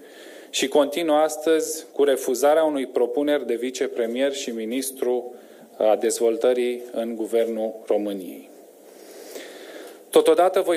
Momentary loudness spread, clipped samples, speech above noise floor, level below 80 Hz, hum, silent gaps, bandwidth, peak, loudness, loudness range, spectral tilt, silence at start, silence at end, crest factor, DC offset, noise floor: 20 LU; under 0.1%; 25 dB; under -90 dBFS; none; none; 16 kHz; -2 dBFS; -22 LUFS; 5 LU; -3 dB/octave; 0 s; 0 s; 20 dB; under 0.1%; -47 dBFS